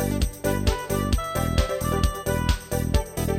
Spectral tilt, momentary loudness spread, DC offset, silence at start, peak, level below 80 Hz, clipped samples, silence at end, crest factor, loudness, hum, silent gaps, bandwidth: -5.5 dB/octave; 2 LU; under 0.1%; 0 s; -6 dBFS; -28 dBFS; under 0.1%; 0 s; 18 dB; -25 LUFS; none; none; 17 kHz